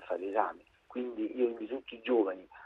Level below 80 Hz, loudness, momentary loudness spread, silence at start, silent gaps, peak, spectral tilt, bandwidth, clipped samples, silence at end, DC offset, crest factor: -74 dBFS; -34 LUFS; 10 LU; 0 s; none; -14 dBFS; -6.5 dB/octave; 4.1 kHz; under 0.1%; 0 s; under 0.1%; 20 dB